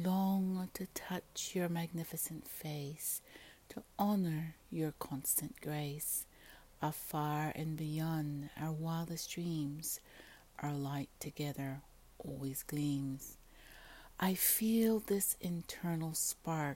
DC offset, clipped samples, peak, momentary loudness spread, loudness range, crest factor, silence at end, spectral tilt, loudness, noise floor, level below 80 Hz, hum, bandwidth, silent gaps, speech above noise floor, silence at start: under 0.1%; under 0.1%; -18 dBFS; 18 LU; 7 LU; 22 dB; 0 s; -5 dB/octave; -38 LUFS; -60 dBFS; -64 dBFS; none; 16.5 kHz; none; 21 dB; 0 s